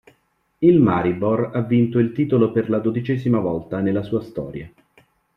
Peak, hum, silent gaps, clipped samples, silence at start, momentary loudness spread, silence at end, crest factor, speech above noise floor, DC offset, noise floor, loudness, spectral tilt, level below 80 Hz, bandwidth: -4 dBFS; none; none; under 0.1%; 0.6 s; 10 LU; 0.7 s; 16 dB; 44 dB; under 0.1%; -63 dBFS; -20 LUFS; -10.5 dB/octave; -54 dBFS; 5.2 kHz